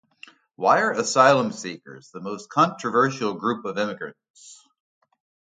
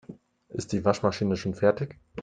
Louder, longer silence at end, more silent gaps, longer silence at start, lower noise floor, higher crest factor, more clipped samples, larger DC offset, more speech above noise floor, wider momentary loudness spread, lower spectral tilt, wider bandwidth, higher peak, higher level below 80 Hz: first, -21 LUFS vs -27 LUFS; first, 1.05 s vs 0 s; first, 4.30-4.34 s vs none; first, 0.6 s vs 0.1 s; about the same, -51 dBFS vs -48 dBFS; about the same, 22 dB vs 22 dB; neither; neither; first, 28 dB vs 22 dB; first, 19 LU vs 12 LU; second, -4 dB/octave vs -6.5 dB/octave; about the same, 9.6 kHz vs 9.4 kHz; first, -2 dBFS vs -6 dBFS; second, -74 dBFS vs -58 dBFS